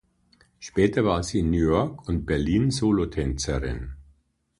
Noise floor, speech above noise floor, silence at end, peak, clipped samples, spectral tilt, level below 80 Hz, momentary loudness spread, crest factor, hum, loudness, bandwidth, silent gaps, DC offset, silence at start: -63 dBFS; 40 dB; 0.6 s; -6 dBFS; under 0.1%; -6 dB/octave; -36 dBFS; 10 LU; 18 dB; none; -24 LUFS; 11.5 kHz; none; under 0.1%; 0.6 s